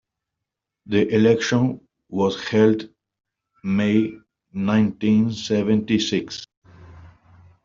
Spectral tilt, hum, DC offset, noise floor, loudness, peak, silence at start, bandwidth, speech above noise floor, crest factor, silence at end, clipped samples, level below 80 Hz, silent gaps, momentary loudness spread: -6 dB/octave; none; under 0.1%; -84 dBFS; -21 LUFS; -4 dBFS; 0.85 s; 7.6 kHz; 64 dB; 18 dB; 0.6 s; under 0.1%; -58 dBFS; 6.57-6.62 s; 16 LU